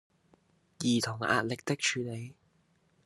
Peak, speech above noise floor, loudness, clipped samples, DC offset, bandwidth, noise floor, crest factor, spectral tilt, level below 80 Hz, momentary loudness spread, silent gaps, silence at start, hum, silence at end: -10 dBFS; 39 dB; -31 LUFS; under 0.1%; under 0.1%; 12.5 kHz; -70 dBFS; 24 dB; -4 dB/octave; -74 dBFS; 11 LU; none; 0.8 s; none; 0.75 s